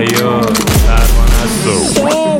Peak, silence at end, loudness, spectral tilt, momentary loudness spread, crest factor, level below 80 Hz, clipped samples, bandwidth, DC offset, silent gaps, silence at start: 0 dBFS; 0 s; -11 LUFS; -4.5 dB/octave; 2 LU; 10 dB; -12 dBFS; under 0.1%; 17 kHz; under 0.1%; none; 0 s